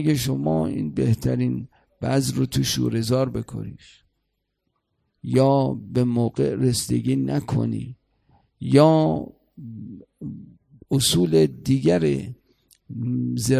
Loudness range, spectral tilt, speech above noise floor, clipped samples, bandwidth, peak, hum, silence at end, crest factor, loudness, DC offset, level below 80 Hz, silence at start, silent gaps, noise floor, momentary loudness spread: 4 LU; -6 dB/octave; 54 dB; under 0.1%; 15 kHz; -2 dBFS; none; 0 s; 20 dB; -22 LUFS; under 0.1%; -48 dBFS; 0 s; none; -76 dBFS; 20 LU